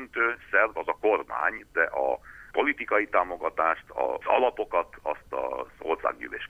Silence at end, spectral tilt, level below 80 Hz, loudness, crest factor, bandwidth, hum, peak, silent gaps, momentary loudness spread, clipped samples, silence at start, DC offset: 0.05 s; -5 dB/octave; -58 dBFS; -27 LUFS; 20 dB; 12.5 kHz; none; -6 dBFS; none; 8 LU; under 0.1%; 0 s; under 0.1%